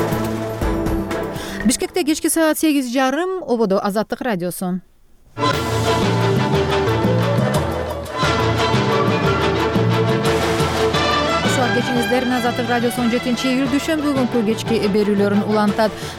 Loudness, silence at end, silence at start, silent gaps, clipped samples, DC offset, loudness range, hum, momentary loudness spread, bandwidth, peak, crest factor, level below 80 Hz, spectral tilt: -18 LUFS; 0 s; 0 s; none; under 0.1%; under 0.1%; 3 LU; none; 6 LU; 18.5 kHz; -6 dBFS; 12 dB; -36 dBFS; -5 dB/octave